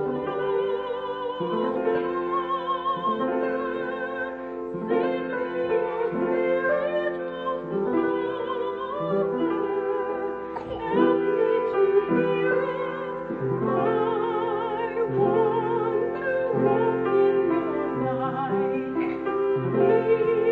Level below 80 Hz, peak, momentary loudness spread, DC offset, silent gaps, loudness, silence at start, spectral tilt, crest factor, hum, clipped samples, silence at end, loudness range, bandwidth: -58 dBFS; -8 dBFS; 8 LU; under 0.1%; none; -25 LUFS; 0 s; -9 dB/octave; 16 dB; none; under 0.1%; 0 s; 3 LU; 4.6 kHz